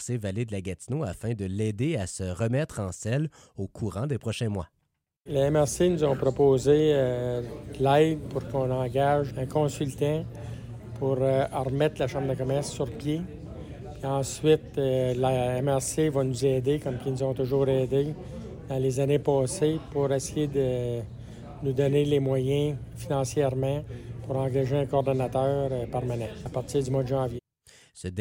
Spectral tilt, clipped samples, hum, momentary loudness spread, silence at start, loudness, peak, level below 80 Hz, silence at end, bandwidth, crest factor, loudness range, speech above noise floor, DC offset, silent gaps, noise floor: -6.5 dB/octave; under 0.1%; none; 12 LU; 0 s; -27 LUFS; -10 dBFS; -50 dBFS; 0 s; 16.5 kHz; 18 dB; 5 LU; 31 dB; under 0.1%; none; -58 dBFS